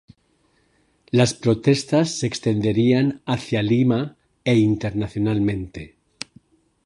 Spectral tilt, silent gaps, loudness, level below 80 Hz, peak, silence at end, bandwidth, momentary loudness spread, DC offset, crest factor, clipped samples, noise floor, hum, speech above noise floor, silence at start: -6 dB/octave; none; -21 LUFS; -50 dBFS; -4 dBFS; 1 s; 11.5 kHz; 16 LU; under 0.1%; 18 dB; under 0.1%; -64 dBFS; none; 44 dB; 1.15 s